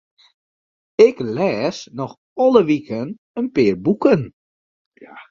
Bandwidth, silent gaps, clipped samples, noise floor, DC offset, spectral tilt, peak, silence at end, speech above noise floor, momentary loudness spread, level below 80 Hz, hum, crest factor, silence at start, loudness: 7.4 kHz; 2.18-2.36 s, 3.18-3.35 s, 4.33-4.92 s; under 0.1%; under -90 dBFS; under 0.1%; -7 dB/octave; 0 dBFS; 0.1 s; over 73 dB; 15 LU; -56 dBFS; none; 18 dB; 1 s; -18 LUFS